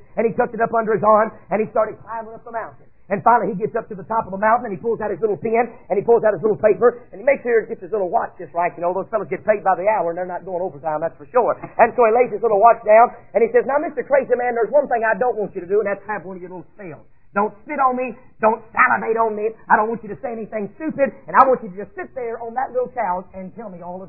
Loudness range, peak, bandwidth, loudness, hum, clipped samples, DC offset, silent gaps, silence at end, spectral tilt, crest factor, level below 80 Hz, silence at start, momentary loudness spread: 5 LU; 0 dBFS; 2.9 kHz; -19 LUFS; none; under 0.1%; 0.5%; none; 0 s; -11.5 dB/octave; 20 dB; -56 dBFS; 0.15 s; 14 LU